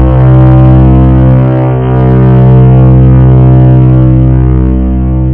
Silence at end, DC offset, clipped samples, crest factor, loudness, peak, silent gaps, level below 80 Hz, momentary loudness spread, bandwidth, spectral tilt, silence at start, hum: 0 s; under 0.1%; 5%; 2 dB; -4 LUFS; 0 dBFS; none; -12 dBFS; 5 LU; 3.3 kHz; -13 dB/octave; 0 s; none